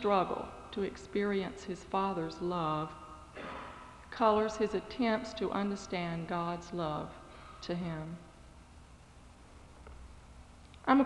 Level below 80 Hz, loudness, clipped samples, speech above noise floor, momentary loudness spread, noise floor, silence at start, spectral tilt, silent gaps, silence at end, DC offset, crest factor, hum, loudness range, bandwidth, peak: -58 dBFS; -35 LUFS; under 0.1%; 22 dB; 25 LU; -56 dBFS; 0 s; -6 dB/octave; none; 0 s; under 0.1%; 22 dB; none; 12 LU; 11.5 kHz; -12 dBFS